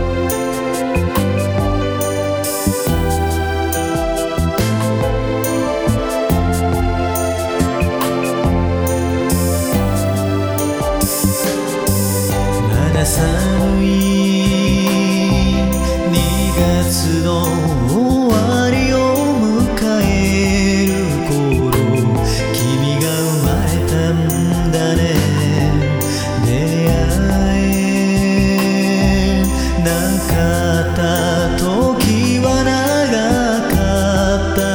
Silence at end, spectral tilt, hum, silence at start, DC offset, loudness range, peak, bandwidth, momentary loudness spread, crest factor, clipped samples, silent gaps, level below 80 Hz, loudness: 0 s; -5.5 dB/octave; none; 0 s; under 0.1%; 3 LU; -2 dBFS; over 20 kHz; 4 LU; 14 dB; under 0.1%; none; -24 dBFS; -15 LUFS